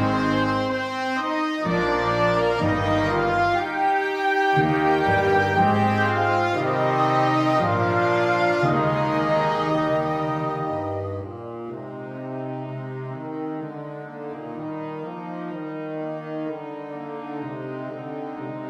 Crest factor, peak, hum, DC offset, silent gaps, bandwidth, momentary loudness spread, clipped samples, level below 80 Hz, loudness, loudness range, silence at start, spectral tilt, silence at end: 16 dB; -8 dBFS; none; under 0.1%; none; 14 kHz; 14 LU; under 0.1%; -50 dBFS; -23 LUFS; 12 LU; 0 s; -7 dB/octave; 0 s